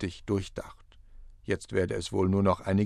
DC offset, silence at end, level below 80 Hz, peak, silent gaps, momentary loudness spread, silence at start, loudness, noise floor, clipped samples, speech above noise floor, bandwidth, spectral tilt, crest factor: under 0.1%; 0 s; -50 dBFS; -12 dBFS; none; 17 LU; 0 s; -29 LUFS; -50 dBFS; under 0.1%; 21 dB; 12 kHz; -6.5 dB/octave; 18 dB